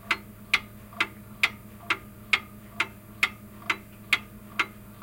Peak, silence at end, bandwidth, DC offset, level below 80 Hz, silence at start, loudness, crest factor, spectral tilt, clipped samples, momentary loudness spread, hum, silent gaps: -6 dBFS; 0 s; 17 kHz; under 0.1%; -56 dBFS; 0.05 s; -29 LUFS; 26 dB; -2 dB/octave; under 0.1%; 6 LU; none; none